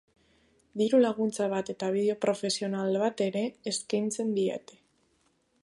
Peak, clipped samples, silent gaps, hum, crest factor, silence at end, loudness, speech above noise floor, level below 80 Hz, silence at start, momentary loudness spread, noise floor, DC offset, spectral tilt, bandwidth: -12 dBFS; under 0.1%; none; none; 18 dB; 1.05 s; -29 LUFS; 42 dB; -74 dBFS; 0.75 s; 8 LU; -71 dBFS; under 0.1%; -4.5 dB/octave; 11.5 kHz